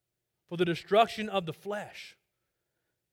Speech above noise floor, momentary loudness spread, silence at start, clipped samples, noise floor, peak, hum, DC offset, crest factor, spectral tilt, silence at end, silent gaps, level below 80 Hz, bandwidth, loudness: 53 dB; 19 LU; 0.5 s; under 0.1%; -83 dBFS; -12 dBFS; none; under 0.1%; 22 dB; -5.5 dB/octave; 1 s; none; -70 dBFS; 16.5 kHz; -30 LUFS